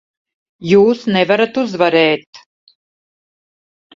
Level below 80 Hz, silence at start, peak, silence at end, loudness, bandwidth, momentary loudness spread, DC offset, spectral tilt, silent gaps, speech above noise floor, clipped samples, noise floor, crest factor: -58 dBFS; 0.6 s; 0 dBFS; 1.6 s; -14 LUFS; 7.6 kHz; 7 LU; under 0.1%; -6 dB/octave; 2.27-2.33 s; over 77 dB; under 0.1%; under -90 dBFS; 16 dB